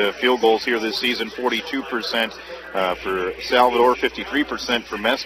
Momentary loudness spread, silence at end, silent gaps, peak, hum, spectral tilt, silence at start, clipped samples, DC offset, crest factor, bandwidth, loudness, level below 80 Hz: 8 LU; 0 s; none; -2 dBFS; none; -3 dB/octave; 0 s; under 0.1%; under 0.1%; 18 dB; 15.5 kHz; -21 LUFS; -50 dBFS